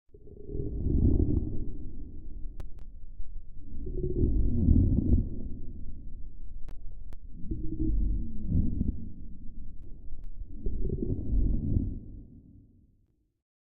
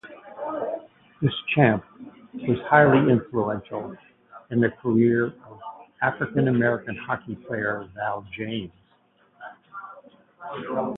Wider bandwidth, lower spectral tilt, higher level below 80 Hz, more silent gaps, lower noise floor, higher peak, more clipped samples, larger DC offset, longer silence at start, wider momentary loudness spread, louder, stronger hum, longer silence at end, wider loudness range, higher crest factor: second, 1.1 kHz vs 4 kHz; first, -15 dB/octave vs -10.5 dB/octave; first, -34 dBFS vs -58 dBFS; neither; first, -69 dBFS vs -62 dBFS; second, -10 dBFS vs -2 dBFS; neither; neither; about the same, 0.1 s vs 0.05 s; about the same, 22 LU vs 21 LU; second, -31 LUFS vs -24 LUFS; neither; first, 1.15 s vs 0 s; second, 6 LU vs 10 LU; about the same, 20 dB vs 22 dB